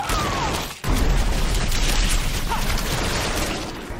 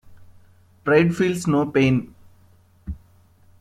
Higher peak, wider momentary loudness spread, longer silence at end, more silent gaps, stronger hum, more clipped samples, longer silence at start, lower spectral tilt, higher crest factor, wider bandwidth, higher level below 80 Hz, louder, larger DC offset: second, -8 dBFS vs -2 dBFS; second, 3 LU vs 22 LU; second, 0 s vs 0.65 s; neither; neither; neither; about the same, 0 s vs 0.1 s; second, -3.5 dB/octave vs -7 dB/octave; second, 14 dB vs 20 dB; first, 16 kHz vs 14 kHz; first, -24 dBFS vs -46 dBFS; second, -23 LUFS vs -20 LUFS; neither